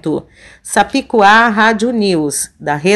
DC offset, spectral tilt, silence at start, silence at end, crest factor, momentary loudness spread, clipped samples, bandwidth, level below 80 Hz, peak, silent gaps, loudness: under 0.1%; -3.5 dB/octave; 0.05 s; 0 s; 12 dB; 11 LU; 0.4%; 12.5 kHz; -48 dBFS; 0 dBFS; none; -12 LUFS